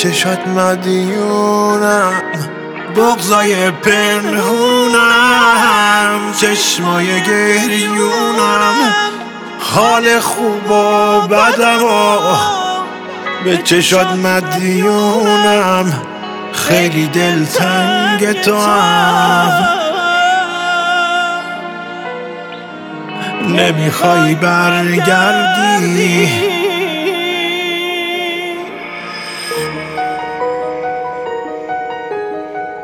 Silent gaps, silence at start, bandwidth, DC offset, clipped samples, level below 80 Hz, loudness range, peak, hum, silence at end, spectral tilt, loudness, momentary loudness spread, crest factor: none; 0 s; over 20 kHz; under 0.1%; under 0.1%; -54 dBFS; 8 LU; 0 dBFS; none; 0 s; -3.5 dB/octave; -12 LUFS; 13 LU; 12 dB